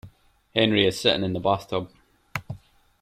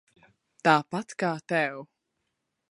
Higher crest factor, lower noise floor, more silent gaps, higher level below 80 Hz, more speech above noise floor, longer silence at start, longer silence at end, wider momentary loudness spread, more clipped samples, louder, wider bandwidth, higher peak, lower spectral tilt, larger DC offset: about the same, 22 dB vs 26 dB; second, -51 dBFS vs -80 dBFS; neither; first, -56 dBFS vs -78 dBFS; second, 28 dB vs 54 dB; second, 0.05 s vs 0.65 s; second, 0.45 s vs 0.85 s; first, 20 LU vs 10 LU; neither; first, -24 LUFS vs -27 LUFS; first, 15.5 kHz vs 11.5 kHz; about the same, -4 dBFS vs -4 dBFS; about the same, -5 dB/octave vs -5.5 dB/octave; neither